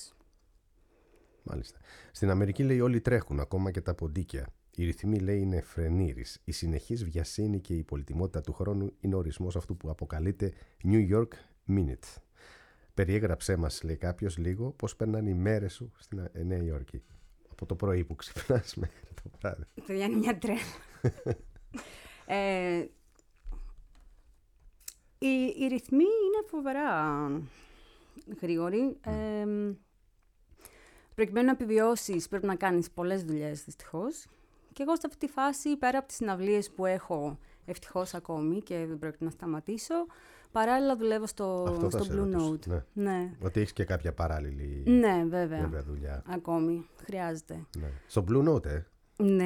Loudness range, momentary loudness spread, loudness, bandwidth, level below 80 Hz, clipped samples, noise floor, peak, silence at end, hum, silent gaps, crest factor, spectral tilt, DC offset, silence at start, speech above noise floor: 5 LU; 15 LU; -32 LUFS; 16.5 kHz; -46 dBFS; under 0.1%; -66 dBFS; -12 dBFS; 0 s; none; none; 20 dB; -7 dB/octave; under 0.1%; 0 s; 35 dB